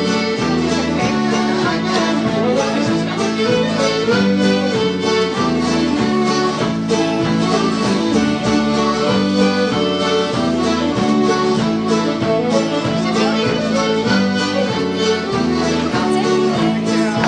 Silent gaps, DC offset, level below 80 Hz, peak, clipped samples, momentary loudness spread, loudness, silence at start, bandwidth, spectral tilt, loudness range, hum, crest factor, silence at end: none; under 0.1%; -44 dBFS; -4 dBFS; under 0.1%; 2 LU; -16 LUFS; 0 s; 10 kHz; -5 dB/octave; 1 LU; none; 12 dB; 0 s